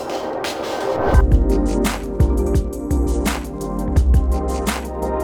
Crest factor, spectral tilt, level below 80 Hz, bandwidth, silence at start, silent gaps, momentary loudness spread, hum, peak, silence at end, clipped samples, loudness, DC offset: 16 dB; -6.5 dB/octave; -20 dBFS; 17.5 kHz; 0 s; none; 7 LU; none; -2 dBFS; 0 s; under 0.1%; -20 LUFS; under 0.1%